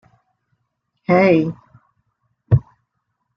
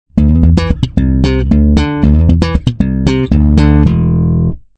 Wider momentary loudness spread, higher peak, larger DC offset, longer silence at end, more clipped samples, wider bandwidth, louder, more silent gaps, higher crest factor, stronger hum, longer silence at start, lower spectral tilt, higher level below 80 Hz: first, 18 LU vs 5 LU; about the same, -2 dBFS vs 0 dBFS; second, under 0.1% vs 0.4%; first, 0.75 s vs 0.2 s; second, under 0.1% vs 2%; second, 6.2 kHz vs 8.2 kHz; second, -17 LUFS vs -11 LUFS; neither; first, 18 dB vs 10 dB; neither; first, 1.1 s vs 0.15 s; about the same, -9.5 dB/octave vs -8.5 dB/octave; second, -46 dBFS vs -14 dBFS